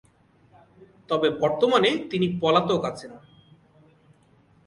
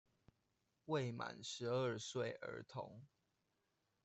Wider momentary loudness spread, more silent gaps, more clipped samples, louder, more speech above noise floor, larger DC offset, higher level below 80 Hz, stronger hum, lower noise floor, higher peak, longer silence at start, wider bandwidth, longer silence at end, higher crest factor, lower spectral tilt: about the same, 12 LU vs 13 LU; neither; neither; first, -23 LUFS vs -45 LUFS; second, 36 dB vs 41 dB; neither; first, -62 dBFS vs -82 dBFS; neither; second, -59 dBFS vs -86 dBFS; first, -6 dBFS vs -28 dBFS; first, 1.1 s vs 0.85 s; first, 11.5 kHz vs 8.2 kHz; first, 1.5 s vs 1 s; about the same, 20 dB vs 18 dB; about the same, -6 dB/octave vs -5 dB/octave